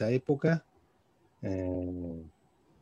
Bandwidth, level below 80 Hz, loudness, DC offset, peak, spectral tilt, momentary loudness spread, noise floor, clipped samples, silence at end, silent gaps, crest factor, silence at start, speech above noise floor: 7.2 kHz; -60 dBFS; -33 LUFS; under 0.1%; -16 dBFS; -8.5 dB/octave; 14 LU; -69 dBFS; under 0.1%; 0.5 s; none; 18 dB; 0 s; 37 dB